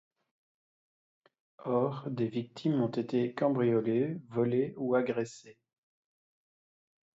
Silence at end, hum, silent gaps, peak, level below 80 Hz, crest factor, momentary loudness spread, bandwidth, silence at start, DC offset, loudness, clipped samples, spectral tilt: 1.65 s; none; none; -16 dBFS; -76 dBFS; 18 dB; 6 LU; 8 kHz; 1.6 s; under 0.1%; -32 LUFS; under 0.1%; -8 dB/octave